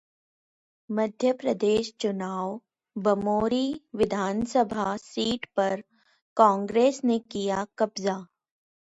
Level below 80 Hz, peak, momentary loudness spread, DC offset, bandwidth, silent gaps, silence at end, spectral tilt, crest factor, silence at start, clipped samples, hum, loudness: -60 dBFS; -4 dBFS; 10 LU; under 0.1%; 10.5 kHz; 6.22-6.36 s; 0.75 s; -5.5 dB/octave; 22 dB; 0.9 s; under 0.1%; none; -27 LUFS